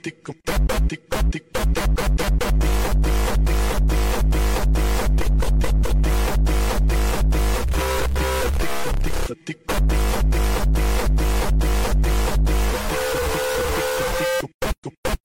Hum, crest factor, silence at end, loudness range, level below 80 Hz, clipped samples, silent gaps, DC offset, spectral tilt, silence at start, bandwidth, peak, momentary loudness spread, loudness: none; 8 dB; 0.1 s; 2 LU; -20 dBFS; under 0.1%; 14.54-14.59 s, 14.78-14.82 s, 14.98-15.03 s; under 0.1%; -5 dB/octave; 0.05 s; 17 kHz; -12 dBFS; 4 LU; -22 LUFS